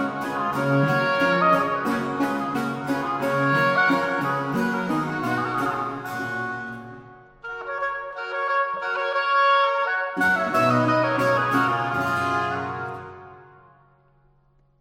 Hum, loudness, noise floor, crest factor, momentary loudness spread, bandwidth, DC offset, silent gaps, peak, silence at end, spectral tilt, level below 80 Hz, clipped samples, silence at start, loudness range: none; -23 LUFS; -61 dBFS; 16 dB; 11 LU; 16.5 kHz; under 0.1%; none; -6 dBFS; 1.35 s; -6 dB/octave; -60 dBFS; under 0.1%; 0 s; 7 LU